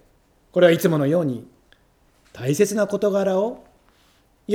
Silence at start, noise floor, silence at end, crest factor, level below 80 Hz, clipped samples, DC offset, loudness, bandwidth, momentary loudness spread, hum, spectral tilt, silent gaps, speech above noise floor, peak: 0.55 s; -59 dBFS; 0 s; 20 dB; -62 dBFS; under 0.1%; under 0.1%; -20 LUFS; 19.5 kHz; 15 LU; none; -6 dB/octave; none; 40 dB; -2 dBFS